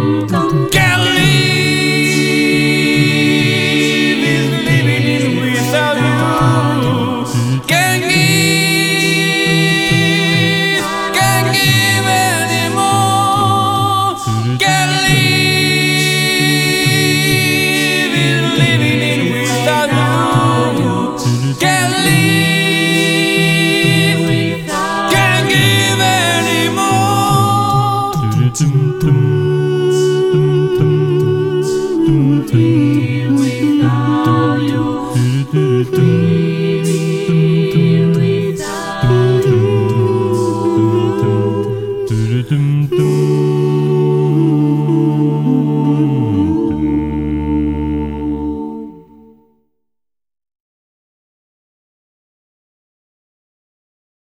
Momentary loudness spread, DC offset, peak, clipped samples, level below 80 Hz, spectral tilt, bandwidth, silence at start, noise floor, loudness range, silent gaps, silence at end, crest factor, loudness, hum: 5 LU; under 0.1%; 0 dBFS; under 0.1%; -38 dBFS; -5 dB/octave; 17.5 kHz; 0 s; -80 dBFS; 3 LU; none; 5.3 s; 12 dB; -12 LUFS; none